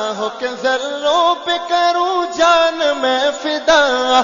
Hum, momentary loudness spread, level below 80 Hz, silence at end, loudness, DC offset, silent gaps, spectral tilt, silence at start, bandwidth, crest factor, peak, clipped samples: none; 7 LU; -54 dBFS; 0 s; -15 LUFS; under 0.1%; none; -1.5 dB/octave; 0 s; 7.4 kHz; 14 dB; 0 dBFS; under 0.1%